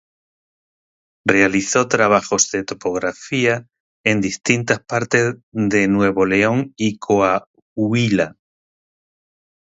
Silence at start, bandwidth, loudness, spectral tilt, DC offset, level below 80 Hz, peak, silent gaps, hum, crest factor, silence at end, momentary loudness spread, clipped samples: 1.25 s; 8 kHz; -18 LUFS; -4.5 dB/octave; under 0.1%; -52 dBFS; 0 dBFS; 3.80-4.04 s, 5.43-5.52 s, 7.47-7.54 s, 7.62-7.76 s; none; 18 dB; 1.3 s; 8 LU; under 0.1%